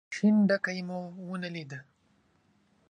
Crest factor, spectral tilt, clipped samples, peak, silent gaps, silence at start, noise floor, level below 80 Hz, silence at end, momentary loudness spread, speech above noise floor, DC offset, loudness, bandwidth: 18 dB; -6.5 dB/octave; under 0.1%; -14 dBFS; none; 0.1 s; -69 dBFS; -78 dBFS; 1.1 s; 18 LU; 40 dB; under 0.1%; -29 LUFS; 9.4 kHz